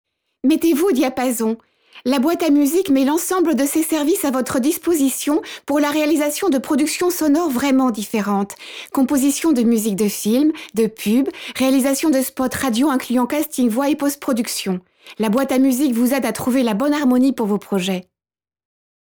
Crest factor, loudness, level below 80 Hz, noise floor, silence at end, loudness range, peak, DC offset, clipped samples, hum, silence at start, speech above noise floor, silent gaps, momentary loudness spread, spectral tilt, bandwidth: 12 dB; -18 LUFS; -56 dBFS; under -90 dBFS; 1.05 s; 1 LU; -6 dBFS; under 0.1%; under 0.1%; none; 0.45 s; over 72 dB; none; 6 LU; -4.5 dB/octave; over 20 kHz